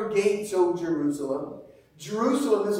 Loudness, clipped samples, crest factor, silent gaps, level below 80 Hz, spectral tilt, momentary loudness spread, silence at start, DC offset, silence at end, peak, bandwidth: -26 LUFS; under 0.1%; 16 dB; none; -66 dBFS; -5.5 dB/octave; 15 LU; 0 s; under 0.1%; 0 s; -10 dBFS; 16 kHz